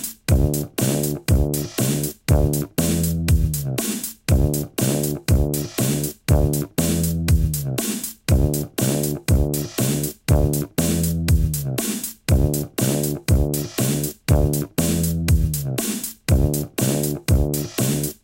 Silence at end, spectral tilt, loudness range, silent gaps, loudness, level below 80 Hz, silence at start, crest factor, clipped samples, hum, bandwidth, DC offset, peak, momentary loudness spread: 0.1 s; -5.5 dB/octave; 1 LU; none; -21 LUFS; -26 dBFS; 0 s; 18 dB; under 0.1%; none; 17 kHz; under 0.1%; -4 dBFS; 4 LU